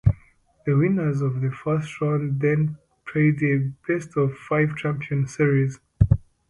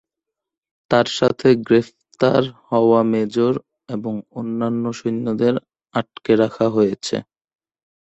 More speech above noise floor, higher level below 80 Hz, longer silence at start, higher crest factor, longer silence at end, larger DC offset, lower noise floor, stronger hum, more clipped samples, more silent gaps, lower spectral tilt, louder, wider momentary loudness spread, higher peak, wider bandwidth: second, 34 dB vs 66 dB; first, -38 dBFS vs -58 dBFS; second, 0.05 s vs 0.9 s; about the same, 20 dB vs 18 dB; second, 0.3 s vs 0.8 s; neither; second, -56 dBFS vs -85 dBFS; neither; neither; neither; first, -8.5 dB/octave vs -6.5 dB/octave; second, -23 LUFS vs -19 LUFS; second, 7 LU vs 11 LU; about the same, -2 dBFS vs -2 dBFS; first, 10.5 kHz vs 8.2 kHz